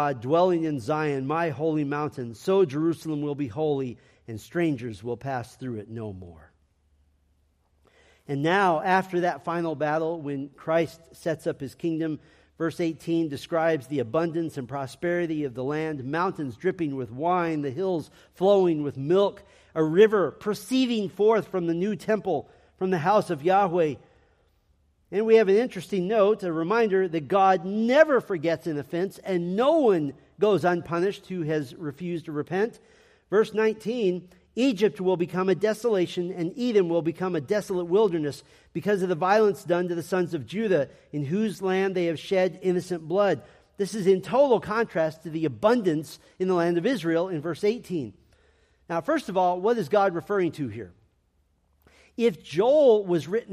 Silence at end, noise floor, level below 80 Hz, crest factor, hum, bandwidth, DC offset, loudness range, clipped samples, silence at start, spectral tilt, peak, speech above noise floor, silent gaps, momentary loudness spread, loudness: 0 s; -68 dBFS; -66 dBFS; 20 dB; none; 14.5 kHz; under 0.1%; 6 LU; under 0.1%; 0 s; -6.5 dB/octave; -6 dBFS; 43 dB; none; 11 LU; -25 LUFS